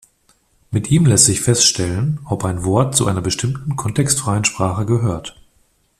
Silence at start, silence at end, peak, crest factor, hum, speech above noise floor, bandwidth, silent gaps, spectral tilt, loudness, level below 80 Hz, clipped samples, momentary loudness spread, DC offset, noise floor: 0.7 s; 0.7 s; 0 dBFS; 18 dB; none; 43 dB; 15 kHz; none; -4 dB/octave; -16 LUFS; -44 dBFS; under 0.1%; 10 LU; under 0.1%; -59 dBFS